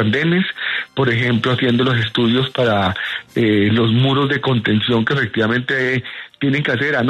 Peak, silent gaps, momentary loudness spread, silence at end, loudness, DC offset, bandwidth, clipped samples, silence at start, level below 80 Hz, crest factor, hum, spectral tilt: -4 dBFS; none; 5 LU; 0 s; -17 LUFS; under 0.1%; 9.4 kHz; under 0.1%; 0 s; -52 dBFS; 12 dB; none; -7 dB/octave